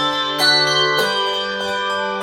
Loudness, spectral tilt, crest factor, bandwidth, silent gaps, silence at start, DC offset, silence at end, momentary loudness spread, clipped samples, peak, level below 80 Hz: -16 LUFS; -2 dB/octave; 16 dB; 16.5 kHz; none; 0 s; under 0.1%; 0 s; 8 LU; under 0.1%; -2 dBFS; -58 dBFS